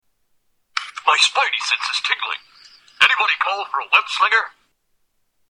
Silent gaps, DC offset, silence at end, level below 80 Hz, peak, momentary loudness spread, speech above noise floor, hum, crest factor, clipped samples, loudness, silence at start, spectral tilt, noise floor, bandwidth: none; under 0.1%; 1 s; -74 dBFS; 0 dBFS; 13 LU; 46 dB; none; 20 dB; under 0.1%; -17 LUFS; 0.75 s; 3 dB/octave; -66 dBFS; 15 kHz